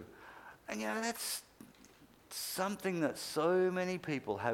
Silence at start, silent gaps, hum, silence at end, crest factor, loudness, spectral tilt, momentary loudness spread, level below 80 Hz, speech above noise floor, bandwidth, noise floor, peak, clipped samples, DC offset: 0 s; none; none; 0 s; 20 dB; -36 LUFS; -4 dB/octave; 17 LU; -74 dBFS; 26 dB; 18.5 kHz; -62 dBFS; -18 dBFS; under 0.1%; under 0.1%